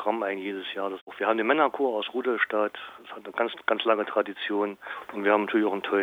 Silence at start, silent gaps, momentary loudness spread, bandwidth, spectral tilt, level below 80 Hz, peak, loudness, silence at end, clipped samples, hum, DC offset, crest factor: 0 s; 1.01-1.07 s; 12 LU; 15 kHz; -6 dB/octave; -78 dBFS; -8 dBFS; -27 LUFS; 0 s; under 0.1%; none; under 0.1%; 20 dB